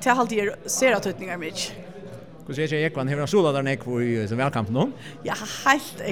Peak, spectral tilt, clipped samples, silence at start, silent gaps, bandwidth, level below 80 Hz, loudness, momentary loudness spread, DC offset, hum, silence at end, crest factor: -4 dBFS; -4.5 dB/octave; under 0.1%; 0 s; none; 19.5 kHz; -58 dBFS; -24 LUFS; 14 LU; 0.3%; none; 0 s; 22 dB